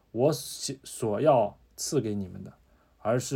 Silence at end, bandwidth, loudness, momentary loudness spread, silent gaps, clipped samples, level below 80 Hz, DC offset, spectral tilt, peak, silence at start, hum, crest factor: 0 s; 17 kHz; -29 LUFS; 14 LU; none; under 0.1%; -64 dBFS; under 0.1%; -5 dB/octave; -10 dBFS; 0.15 s; none; 18 dB